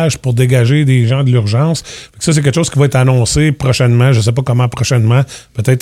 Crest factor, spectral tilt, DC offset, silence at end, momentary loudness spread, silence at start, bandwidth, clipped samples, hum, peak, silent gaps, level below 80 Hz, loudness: 10 dB; -6 dB/octave; under 0.1%; 0 s; 5 LU; 0 s; 13.5 kHz; under 0.1%; none; 0 dBFS; none; -36 dBFS; -12 LUFS